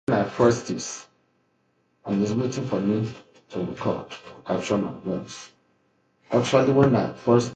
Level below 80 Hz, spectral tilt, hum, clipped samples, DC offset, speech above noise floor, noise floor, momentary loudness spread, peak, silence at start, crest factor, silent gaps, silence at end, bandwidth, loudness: -58 dBFS; -6 dB/octave; none; under 0.1%; under 0.1%; 45 dB; -68 dBFS; 17 LU; -4 dBFS; 0.1 s; 20 dB; none; 0 s; 9.2 kHz; -24 LUFS